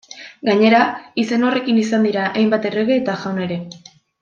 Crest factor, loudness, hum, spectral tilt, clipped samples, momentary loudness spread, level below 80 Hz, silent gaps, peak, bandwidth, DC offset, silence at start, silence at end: 16 dB; -17 LUFS; none; -6 dB/octave; under 0.1%; 11 LU; -64 dBFS; none; -2 dBFS; 7.4 kHz; under 0.1%; 0.1 s; 0.45 s